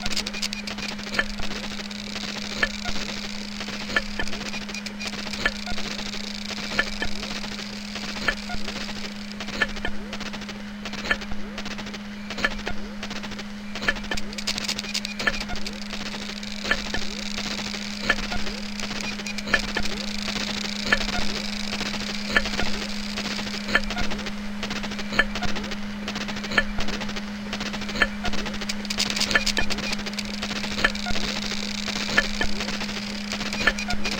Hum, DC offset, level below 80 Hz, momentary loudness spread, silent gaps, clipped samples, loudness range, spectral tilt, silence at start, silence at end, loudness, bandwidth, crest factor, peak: none; under 0.1%; -38 dBFS; 9 LU; none; under 0.1%; 5 LU; -3 dB/octave; 0 s; 0 s; -27 LUFS; 17 kHz; 24 dB; -4 dBFS